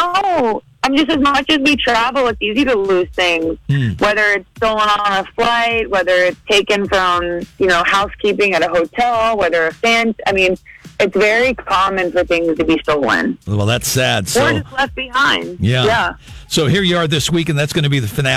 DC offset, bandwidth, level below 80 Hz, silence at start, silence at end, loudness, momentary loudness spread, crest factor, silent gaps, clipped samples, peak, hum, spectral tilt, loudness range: under 0.1%; 16 kHz; -40 dBFS; 0 s; 0 s; -15 LUFS; 5 LU; 14 dB; none; under 0.1%; -2 dBFS; none; -4.5 dB/octave; 1 LU